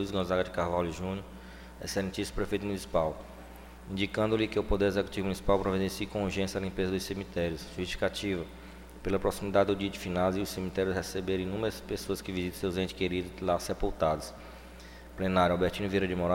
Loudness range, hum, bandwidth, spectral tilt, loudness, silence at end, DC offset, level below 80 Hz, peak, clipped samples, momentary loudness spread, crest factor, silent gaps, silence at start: 3 LU; none; 16.5 kHz; -5.5 dB/octave; -32 LUFS; 0 s; under 0.1%; -46 dBFS; -12 dBFS; under 0.1%; 16 LU; 20 dB; none; 0 s